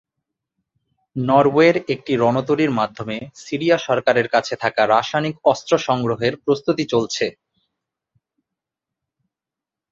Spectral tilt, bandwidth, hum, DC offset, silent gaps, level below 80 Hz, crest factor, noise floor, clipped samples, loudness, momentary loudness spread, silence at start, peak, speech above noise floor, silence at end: -5.5 dB/octave; 7.8 kHz; none; under 0.1%; none; -60 dBFS; 20 dB; -87 dBFS; under 0.1%; -19 LUFS; 10 LU; 1.15 s; -2 dBFS; 69 dB; 2.6 s